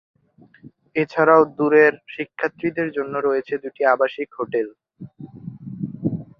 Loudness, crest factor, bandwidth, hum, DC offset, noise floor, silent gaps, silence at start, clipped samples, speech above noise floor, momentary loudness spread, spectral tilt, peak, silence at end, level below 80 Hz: -20 LUFS; 20 dB; 6 kHz; none; under 0.1%; -51 dBFS; none; 0.65 s; under 0.1%; 32 dB; 20 LU; -8.5 dB/octave; -2 dBFS; 0.15 s; -62 dBFS